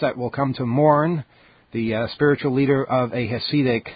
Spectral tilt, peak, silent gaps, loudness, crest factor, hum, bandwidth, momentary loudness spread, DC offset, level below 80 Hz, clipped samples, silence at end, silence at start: -12 dB/octave; -4 dBFS; none; -21 LUFS; 18 dB; none; 5 kHz; 8 LU; under 0.1%; -54 dBFS; under 0.1%; 0 s; 0 s